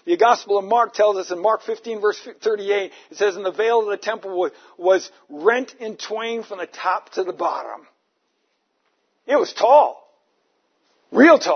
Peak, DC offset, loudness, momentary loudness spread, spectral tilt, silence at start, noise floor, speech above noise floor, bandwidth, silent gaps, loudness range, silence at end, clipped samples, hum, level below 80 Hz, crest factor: 0 dBFS; under 0.1%; -20 LUFS; 14 LU; -3.5 dB/octave; 0.05 s; -70 dBFS; 51 dB; 6.6 kHz; none; 6 LU; 0 s; under 0.1%; none; -80 dBFS; 20 dB